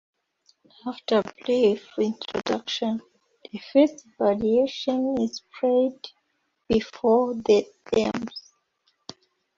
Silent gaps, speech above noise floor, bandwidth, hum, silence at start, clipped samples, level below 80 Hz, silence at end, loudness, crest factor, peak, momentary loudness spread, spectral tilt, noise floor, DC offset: none; 50 dB; 7.6 kHz; none; 0.85 s; under 0.1%; -60 dBFS; 1.15 s; -24 LUFS; 18 dB; -6 dBFS; 18 LU; -5.5 dB/octave; -74 dBFS; under 0.1%